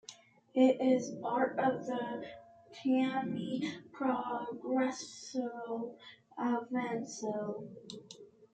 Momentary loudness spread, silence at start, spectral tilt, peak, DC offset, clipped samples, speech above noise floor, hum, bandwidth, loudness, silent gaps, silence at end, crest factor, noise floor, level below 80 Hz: 19 LU; 0.1 s; -5 dB/octave; -16 dBFS; under 0.1%; under 0.1%; 22 dB; none; 8.8 kHz; -35 LUFS; none; 0.1 s; 20 dB; -57 dBFS; -80 dBFS